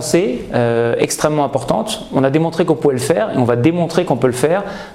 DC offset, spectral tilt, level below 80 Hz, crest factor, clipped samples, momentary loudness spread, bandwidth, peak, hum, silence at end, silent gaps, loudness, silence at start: 0.2%; -5.5 dB/octave; -46 dBFS; 14 dB; under 0.1%; 4 LU; 16 kHz; 0 dBFS; none; 0 s; none; -16 LUFS; 0 s